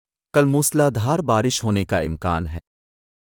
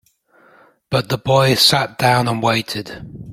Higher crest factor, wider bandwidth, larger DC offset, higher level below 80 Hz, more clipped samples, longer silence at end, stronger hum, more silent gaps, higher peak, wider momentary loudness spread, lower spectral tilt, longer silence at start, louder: about the same, 16 dB vs 18 dB; first, 19.5 kHz vs 16.5 kHz; neither; first, -44 dBFS vs -50 dBFS; neither; first, 0.75 s vs 0 s; neither; neither; second, -6 dBFS vs 0 dBFS; second, 8 LU vs 15 LU; about the same, -5 dB/octave vs -4 dB/octave; second, 0.35 s vs 0.9 s; second, -20 LUFS vs -16 LUFS